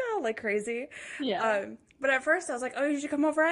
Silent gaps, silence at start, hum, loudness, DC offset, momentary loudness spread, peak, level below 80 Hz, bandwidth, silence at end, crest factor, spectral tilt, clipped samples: none; 0 s; none; -29 LUFS; under 0.1%; 9 LU; -12 dBFS; -72 dBFS; 11.5 kHz; 0 s; 16 dB; -3.5 dB/octave; under 0.1%